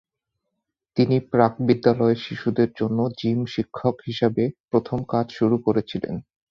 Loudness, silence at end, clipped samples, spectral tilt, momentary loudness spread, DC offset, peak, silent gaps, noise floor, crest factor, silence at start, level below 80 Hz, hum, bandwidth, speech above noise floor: -23 LUFS; 0.3 s; under 0.1%; -8.5 dB/octave; 7 LU; under 0.1%; -2 dBFS; 4.60-4.64 s; -80 dBFS; 20 dB; 0.95 s; -56 dBFS; none; 6.6 kHz; 59 dB